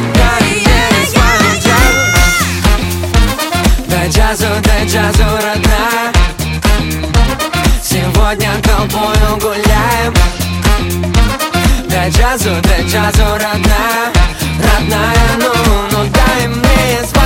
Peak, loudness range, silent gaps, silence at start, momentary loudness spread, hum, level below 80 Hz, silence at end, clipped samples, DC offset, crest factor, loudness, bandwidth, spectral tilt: 0 dBFS; 2 LU; none; 0 s; 4 LU; none; -14 dBFS; 0 s; under 0.1%; 0.2%; 10 dB; -11 LUFS; 17 kHz; -4.5 dB/octave